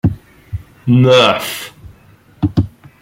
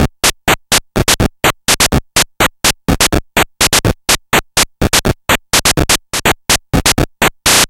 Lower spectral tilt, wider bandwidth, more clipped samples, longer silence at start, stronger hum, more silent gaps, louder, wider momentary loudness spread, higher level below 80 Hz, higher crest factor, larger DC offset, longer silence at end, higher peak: first, -6 dB/octave vs -2.5 dB/octave; about the same, 16.5 kHz vs 17.5 kHz; neither; about the same, 0.05 s vs 0 s; neither; neither; about the same, -14 LUFS vs -12 LUFS; first, 21 LU vs 4 LU; second, -38 dBFS vs -24 dBFS; about the same, 14 dB vs 14 dB; neither; first, 0.35 s vs 0.05 s; about the same, 0 dBFS vs 0 dBFS